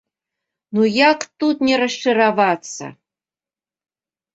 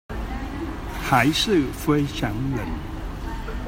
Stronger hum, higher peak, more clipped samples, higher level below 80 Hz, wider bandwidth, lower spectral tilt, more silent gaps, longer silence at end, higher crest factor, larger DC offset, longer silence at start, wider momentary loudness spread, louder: neither; about the same, -2 dBFS vs -4 dBFS; neither; second, -66 dBFS vs -34 dBFS; second, 8.2 kHz vs 16.5 kHz; about the same, -4 dB/octave vs -5 dB/octave; neither; first, 1.45 s vs 0 s; about the same, 18 dB vs 20 dB; neither; first, 0.7 s vs 0.1 s; about the same, 14 LU vs 14 LU; first, -17 LUFS vs -24 LUFS